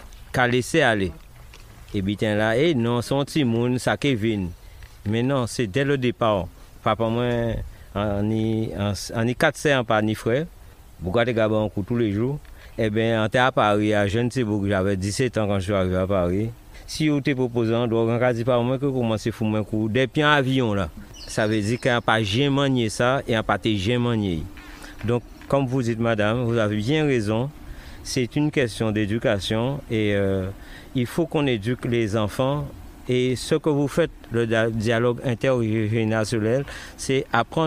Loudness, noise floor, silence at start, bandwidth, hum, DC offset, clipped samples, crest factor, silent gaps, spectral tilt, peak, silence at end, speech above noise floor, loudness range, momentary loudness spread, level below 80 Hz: -23 LUFS; -44 dBFS; 0 s; 15.5 kHz; none; under 0.1%; under 0.1%; 20 dB; none; -6 dB/octave; -2 dBFS; 0 s; 22 dB; 2 LU; 8 LU; -44 dBFS